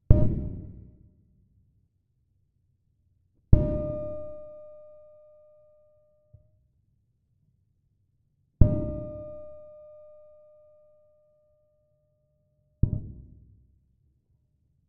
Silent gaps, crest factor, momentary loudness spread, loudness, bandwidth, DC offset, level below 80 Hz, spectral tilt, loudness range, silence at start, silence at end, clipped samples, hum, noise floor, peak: none; 30 dB; 26 LU; -29 LUFS; 2.6 kHz; under 0.1%; -36 dBFS; -13 dB/octave; 15 LU; 0.1 s; 1.7 s; under 0.1%; none; -71 dBFS; 0 dBFS